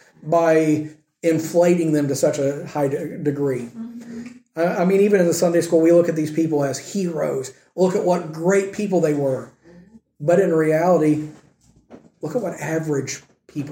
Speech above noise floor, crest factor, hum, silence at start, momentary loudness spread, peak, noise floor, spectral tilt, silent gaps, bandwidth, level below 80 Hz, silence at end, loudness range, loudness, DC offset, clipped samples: 37 dB; 16 dB; none; 0.25 s; 16 LU; -4 dBFS; -56 dBFS; -6.5 dB/octave; none; 16.5 kHz; -64 dBFS; 0 s; 3 LU; -20 LUFS; under 0.1%; under 0.1%